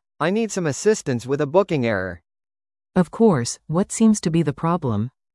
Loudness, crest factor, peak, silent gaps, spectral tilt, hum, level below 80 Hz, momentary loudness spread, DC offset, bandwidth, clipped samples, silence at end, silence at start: -21 LUFS; 18 dB; -2 dBFS; none; -6 dB/octave; none; -54 dBFS; 7 LU; under 0.1%; 12 kHz; under 0.1%; 0.25 s; 0.2 s